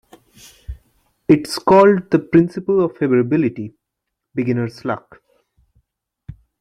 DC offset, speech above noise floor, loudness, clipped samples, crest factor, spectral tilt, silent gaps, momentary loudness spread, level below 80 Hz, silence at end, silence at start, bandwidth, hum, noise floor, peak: under 0.1%; 63 dB; -17 LUFS; under 0.1%; 18 dB; -7 dB/octave; none; 21 LU; -46 dBFS; 0.25 s; 0.7 s; 13 kHz; none; -79 dBFS; -2 dBFS